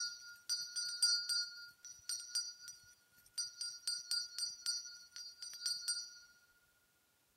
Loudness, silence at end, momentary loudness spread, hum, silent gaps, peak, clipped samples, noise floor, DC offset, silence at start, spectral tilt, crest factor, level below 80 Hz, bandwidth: -39 LUFS; 1.05 s; 18 LU; none; none; -20 dBFS; under 0.1%; -76 dBFS; under 0.1%; 0 s; 5 dB/octave; 24 dB; -90 dBFS; 16 kHz